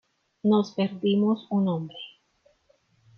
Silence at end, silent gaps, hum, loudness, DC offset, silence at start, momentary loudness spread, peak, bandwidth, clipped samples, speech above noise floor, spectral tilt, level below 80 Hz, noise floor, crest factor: 1.1 s; none; none; -25 LUFS; under 0.1%; 0.45 s; 16 LU; -12 dBFS; 6.6 kHz; under 0.1%; 42 dB; -8 dB/octave; -72 dBFS; -66 dBFS; 14 dB